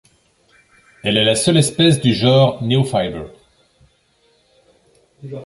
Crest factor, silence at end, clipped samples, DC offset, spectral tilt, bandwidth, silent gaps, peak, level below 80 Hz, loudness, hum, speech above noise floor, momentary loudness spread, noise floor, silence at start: 16 dB; 0 s; under 0.1%; under 0.1%; -5 dB/octave; 11.5 kHz; none; -2 dBFS; -50 dBFS; -15 LUFS; none; 44 dB; 15 LU; -59 dBFS; 1.05 s